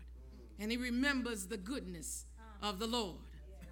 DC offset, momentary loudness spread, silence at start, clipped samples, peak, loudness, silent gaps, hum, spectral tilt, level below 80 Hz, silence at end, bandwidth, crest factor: under 0.1%; 20 LU; 0 s; under 0.1%; -22 dBFS; -39 LUFS; none; none; -3.5 dB/octave; -54 dBFS; 0 s; 19.5 kHz; 20 dB